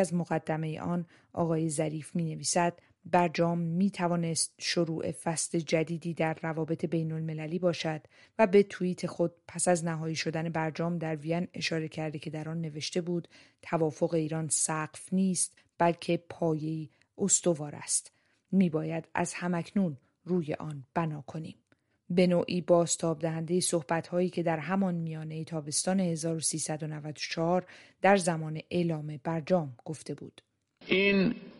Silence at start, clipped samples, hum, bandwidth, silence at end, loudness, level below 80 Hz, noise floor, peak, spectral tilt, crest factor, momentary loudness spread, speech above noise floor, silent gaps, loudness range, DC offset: 0 s; under 0.1%; none; 11.5 kHz; 0 s; -30 LUFS; -72 dBFS; -68 dBFS; -10 dBFS; -5 dB/octave; 20 dB; 11 LU; 37 dB; none; 3 LU; under 0.1%